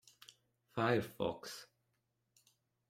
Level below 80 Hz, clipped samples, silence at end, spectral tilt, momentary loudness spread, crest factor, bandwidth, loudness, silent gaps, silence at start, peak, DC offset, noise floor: -74 dBFS; under 0.1%; 1.25 s; -5.5 dB/octave; 22 LU; 24 dB; 16.5 kHz; -39 LUFS; none; 0.75 s; -18 dBFS; under 0.1%; -83 dBFS